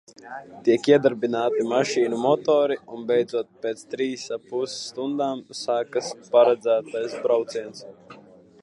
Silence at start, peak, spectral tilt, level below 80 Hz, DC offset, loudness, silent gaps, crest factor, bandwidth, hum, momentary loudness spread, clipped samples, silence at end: 0.25 s; -4 dBFS; -4.5 dB/octave; -74 dBFS; under 0.1%; -23 LUFS; none; 18 dB; 11 kHz; none; 13 LU; under 0.1%; 0.45 s